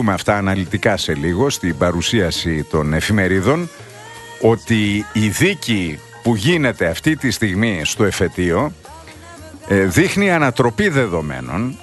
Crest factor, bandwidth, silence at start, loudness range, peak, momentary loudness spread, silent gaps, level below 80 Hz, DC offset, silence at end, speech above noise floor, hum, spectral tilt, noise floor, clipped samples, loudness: 16 dB; 12.5 kHz; 0 s; 1 LU; 0 dBFS; 13 LU; none; -40 dBFS; under 0.1%; 0 s; 21 dB; none; -5 dB/octave; -37 dBFS; under 0.1%; -17 LUFS